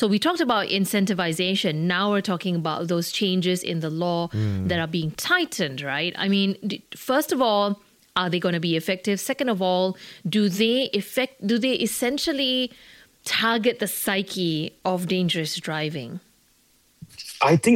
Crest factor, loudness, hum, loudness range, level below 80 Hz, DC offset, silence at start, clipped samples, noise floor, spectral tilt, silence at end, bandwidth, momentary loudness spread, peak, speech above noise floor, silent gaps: 18 dB; -24 LUFS; none; 2 LU; -62 dBFS; under 0.1%; 0 s; under 0.1%; -61 dBFS; -4.5 dB/octave; 0 s; 17 kHz; 6 LU; -6 dBFS; 38 dB; none